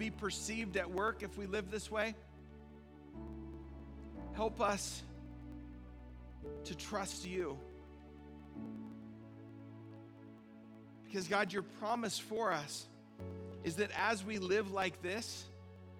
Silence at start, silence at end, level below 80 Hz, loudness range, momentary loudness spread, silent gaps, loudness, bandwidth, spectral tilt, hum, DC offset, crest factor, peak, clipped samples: 0 s; 0 s; -58 dBFS; 9 LU; 20 LU; none; -40 LUFS; 17.5 kHz; -4 dB/octave; none; under 0.1%; 22 dB; -20 dBFS; under 0.1%